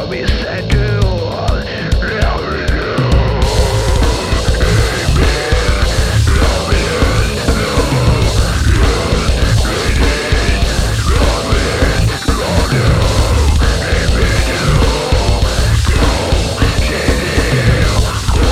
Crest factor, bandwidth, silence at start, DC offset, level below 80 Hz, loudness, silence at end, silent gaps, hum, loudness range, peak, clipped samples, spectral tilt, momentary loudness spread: 12 dB; 15.5 kHz; 0 s; 1%; -16 dBFS; -14 LUFS; 0 s; none; none; 2 LU; 0 dBFS; under 0.1%; -5 dB/octave; 3 LU